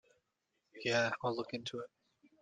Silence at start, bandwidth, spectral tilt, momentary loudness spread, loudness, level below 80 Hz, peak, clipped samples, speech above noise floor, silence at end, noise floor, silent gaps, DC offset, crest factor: 0.75 s; 9.4 kHz; -4 dB/octave; 13 LU; -37 LUFS; -80 dBFS; -16 dBFS; under 0.1%; 47 dB; 0.55 s; -84 dBFS; none; under 0.1%; 24 dB